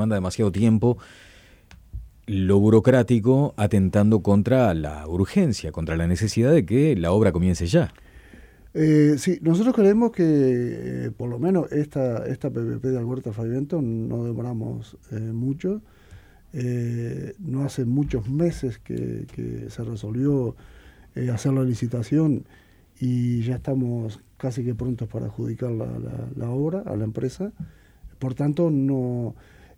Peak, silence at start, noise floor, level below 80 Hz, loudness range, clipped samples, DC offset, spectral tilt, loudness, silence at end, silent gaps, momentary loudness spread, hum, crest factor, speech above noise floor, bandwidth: -6 dBFS; 0 s; -50 dBFS; -46 dBFS; 8 LU; under 0.1%; under 0.1%; -8 dB/octave; -23 LUFS; 0.45 s; none; 14 LU; none; 16 dB; 28 dB; 14 kHz